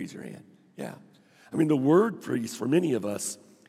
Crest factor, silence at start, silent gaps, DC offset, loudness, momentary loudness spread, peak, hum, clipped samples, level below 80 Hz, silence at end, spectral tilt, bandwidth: 18 dB; 0 s; none; under 0.1%; -26 LUFS; 19 LU; -10 dBFS; none; under 0.1%; -82 dBFS; 0.35 s; -6 dB/octave; 15.5 kHz